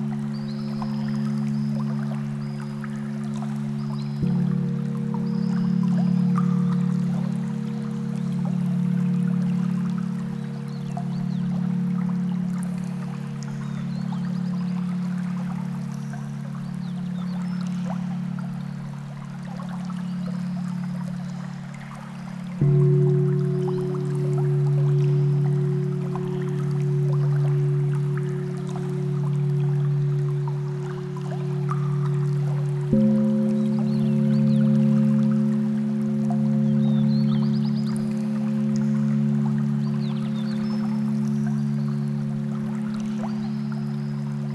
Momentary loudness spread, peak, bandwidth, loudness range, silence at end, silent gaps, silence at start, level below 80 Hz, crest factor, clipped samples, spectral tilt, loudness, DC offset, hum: 10 LU; -8 dBFS; 9.8 kHz; 8 LU; 0 s; none; 0 s; -58 dBFS; 16 dB; under 0.1%; -9 dB/octave; -25 LUFS; under 0.1%; none